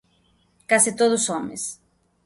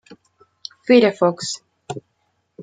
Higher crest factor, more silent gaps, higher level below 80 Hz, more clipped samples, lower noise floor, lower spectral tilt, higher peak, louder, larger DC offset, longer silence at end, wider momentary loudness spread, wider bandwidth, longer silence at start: about the same, 20 dB vs 20 dB; neither; about the same, -66 dBFS vs -68 dBFS; neither; second, -63 dBFS vs -69 dBFS; second, -2 dB/octave vs -4.5 dB/octave; about the same, -4 dBFS vs -2 dBFS; second, -21 LUFS vs -17 LUFS; neither; first, 0.5 s vs 0 s; second, 13 LU vs 21 LU; first, 12 kHz vs 9.4 kHz; first, 0.7 s vs 0.1 s